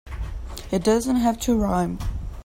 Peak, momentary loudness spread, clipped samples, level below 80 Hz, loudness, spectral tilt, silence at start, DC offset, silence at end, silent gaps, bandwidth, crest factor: -8 dBFS; 14 LU; under 0.1%; -34 dBFS; -23 LUFS; -6 dB/octave; 0.05 s; under 0.1%; 0 s; none; 16.5 kHz; 16 dB